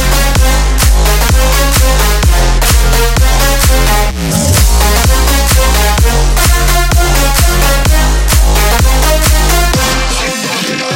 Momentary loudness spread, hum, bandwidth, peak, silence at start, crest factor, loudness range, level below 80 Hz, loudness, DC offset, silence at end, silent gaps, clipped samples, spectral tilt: 2 LU; none; 17 kHz; 0 dBFS; 0 s; 8 dB; 0 LU; -10 dBFS; -9 LUFS; under 0.1%; 0 s; none; under 0.1%; -3.5 dB/octave